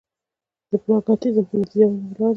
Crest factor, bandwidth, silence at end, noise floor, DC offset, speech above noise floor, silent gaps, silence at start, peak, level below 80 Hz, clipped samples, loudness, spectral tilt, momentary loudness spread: 16 dB; 6 kHz; 0 s; -88 dBFS; under 0.1%; 69 dB; none; 0.7 s; -4 dBFS; -62 dBFS; under 0.1%; -20 LUFS; -10 dB/octave; 6 LU